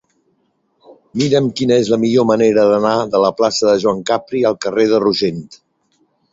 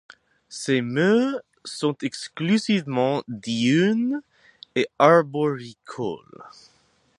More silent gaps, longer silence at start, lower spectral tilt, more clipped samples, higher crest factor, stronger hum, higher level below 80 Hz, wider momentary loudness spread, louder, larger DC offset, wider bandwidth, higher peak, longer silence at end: neither; first, 0.9 s vs 0.5 s; about the same, -5.5 dB/octave vs -5.5 dB/octave; neither; second, 14 dB vs 22 dB; neither; first, -56 dBFS vs -70 dBFS; second, 6 LU vs 14 LU; first, -15 LUFS vs -23 LUFS; neither; second, 7.8 kHz vs 11.5 kHz; about the same, -2 dBFS vs -2 dBFS; about the same, 0.75 s vs 0.7 s